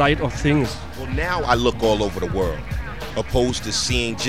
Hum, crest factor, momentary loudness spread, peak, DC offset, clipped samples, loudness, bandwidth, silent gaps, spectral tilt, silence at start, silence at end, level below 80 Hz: none; 20 dB; 10 LU; 0 dBFS; 1%; under 0.1%; -22 LUFS; 16 kHz; none; -4.5 dB/octave; 0 s; 0 s; -32 dBFS